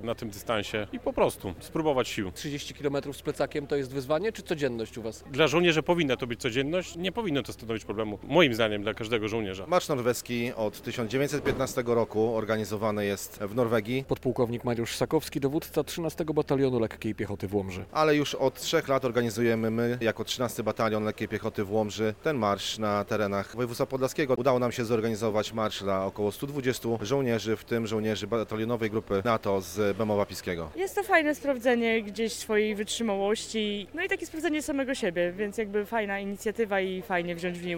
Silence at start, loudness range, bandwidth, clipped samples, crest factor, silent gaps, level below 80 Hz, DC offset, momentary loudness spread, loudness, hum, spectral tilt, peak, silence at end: 0 s; 2 LU; 17 kHz; under 0.1%; 20 dB; none; -54 dBFS; 0.1%; 7 LU; -29 LUFS; none; -5 dB/octave; -8 dBFS; 0 s